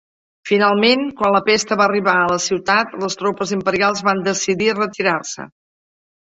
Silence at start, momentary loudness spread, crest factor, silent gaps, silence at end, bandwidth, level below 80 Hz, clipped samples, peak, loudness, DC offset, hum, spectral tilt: 0.45 s; 8 LU; 16 dB; none; 0.8 s; 8.2 kHz; -58 dBFS; under 0.1%; -2 dBFS; -17 LUFS; under 0.1%; none; -3.5 dB/octave